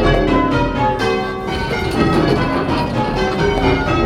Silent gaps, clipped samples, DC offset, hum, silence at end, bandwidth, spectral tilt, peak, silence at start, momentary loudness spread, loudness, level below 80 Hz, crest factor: none; under 0.1%; under 0.1%; none; 0 s; 14.5 kHz; -6.5 dB/octave; 0 dBFS; 0 s; 5 LU; -17 LUFS; -26 dBFS; 16 dB